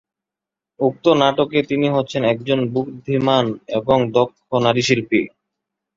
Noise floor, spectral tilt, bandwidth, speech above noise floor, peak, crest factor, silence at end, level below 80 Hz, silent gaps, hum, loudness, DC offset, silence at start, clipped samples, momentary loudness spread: -87 dBFS; -5.5 dB/octave; 7.8 kHz; 69 dB; -2 dBFS; 18 dB; 0.7 s; -54 dBFS; none; none; -18 LUFS; under 0.1%; 0.8 s; under 0.1%; 7 LU